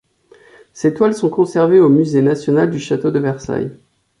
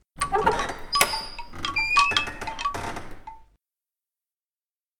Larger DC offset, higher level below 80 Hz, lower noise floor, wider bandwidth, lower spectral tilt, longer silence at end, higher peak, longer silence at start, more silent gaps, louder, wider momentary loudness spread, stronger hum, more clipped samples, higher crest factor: neither; second, -54 dBFS vs -44 dBFS; second, -48 dBFS vs under -90 dBFS; second, 11 kHz vs 19.5 kHz; first, -7.5 dB/octave vs -1.5 dB/octave; second, 0.45 s vs 1.55 s; about the same, -2 dBFS vs -2 dBFS; first, 0.75 s vs 0.15 s; neither; first, -15 LUFS vs -24 LUFS; second, 11 LU vs 17 LU; neither; neither; second, 14 dB vs 26 dB